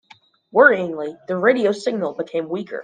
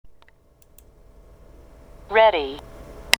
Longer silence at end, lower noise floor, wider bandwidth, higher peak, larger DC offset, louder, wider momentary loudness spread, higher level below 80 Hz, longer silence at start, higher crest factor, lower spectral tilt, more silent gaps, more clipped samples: about the same, 0 s vs 0.05 s; about the same, -52 dBFS vs -55 dBFS; second, 9.4 kHz vs over 20 kHz; about the same, 0 dBFS vs 0 dBFS; neither; about the same, -19 LUFS vs -20 LUFS; second, 13 LU vs 26 LU; second, -70 dBFS vs -48 dBFS; first, 0.55 s vs 0.05 s; second, 20 dB vs 26 dB; first, -5.5 dB/octave vs -1.5 dB/octave; neither; neither